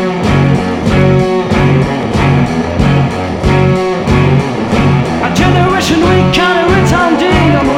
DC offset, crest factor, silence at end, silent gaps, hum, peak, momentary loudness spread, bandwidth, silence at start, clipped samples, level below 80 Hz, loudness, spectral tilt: under 0.1%; 10 dB; 0 s; none; none; 0 dBFS; 4 LU; 12 kHz; 0 s; 0.3%; -24 dBFS; -10 LUFS; -6.5 dB/octave